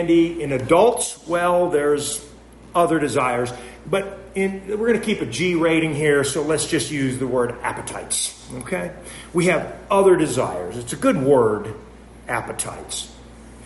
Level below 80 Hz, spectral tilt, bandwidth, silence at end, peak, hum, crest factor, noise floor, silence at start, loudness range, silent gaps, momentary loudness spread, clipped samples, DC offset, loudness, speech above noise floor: -48 dBFS; -4.5 dB/octave; 11.5 kHz; 0 s; -4 dBFS; none; 18 dB; -42 dBFS; 0 s; 3 LU; none; 12 LU; under 0.1%; under 0.1%; -21 LUFS; 21 dB